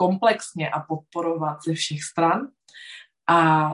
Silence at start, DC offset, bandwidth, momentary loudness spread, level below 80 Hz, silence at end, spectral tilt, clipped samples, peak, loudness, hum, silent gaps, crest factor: 0 s; under 0.1%; 11.5 kHz; 21 LU; -70 dBFS; 0 s; -5 dB/octave; under 0.1%; -6 dBFS; -23 LUFS; none; none; 18 dB